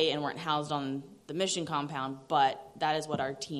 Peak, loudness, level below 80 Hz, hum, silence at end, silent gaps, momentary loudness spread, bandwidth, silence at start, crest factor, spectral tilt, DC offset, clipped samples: -12 dBFS; -32 LUFS; -74 dBFS; none; 0 s; none; 9 LU; 13 kHz; 0 s; 20 dB; -4 dB/octave; under 0.1%; under 0.1%